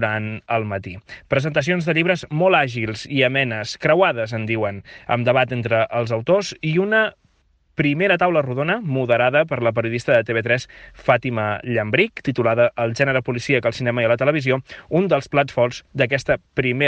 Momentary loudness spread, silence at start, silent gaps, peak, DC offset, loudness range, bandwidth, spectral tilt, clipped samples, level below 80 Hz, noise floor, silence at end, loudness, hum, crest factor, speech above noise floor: 7 LU; 0 s; none; -2 dBFS; under 0.1%; 1 LU; 9 kHz; -6 dB/octave; under 0.1%; -52 dBFS; -61 dBFS; 0 s; -20 LUFS; none; 16 dB; 42 dB